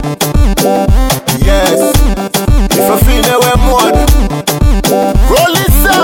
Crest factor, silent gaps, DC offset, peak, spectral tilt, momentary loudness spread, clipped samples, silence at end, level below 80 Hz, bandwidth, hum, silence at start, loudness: 8 dB; none; under 0.1%; 0 dBFS; -4.5 dB/octave; 3 LU; 0.1%; 0 s; -12 dBFS; 17.5 kHz; none; 0 s; -10 LUFS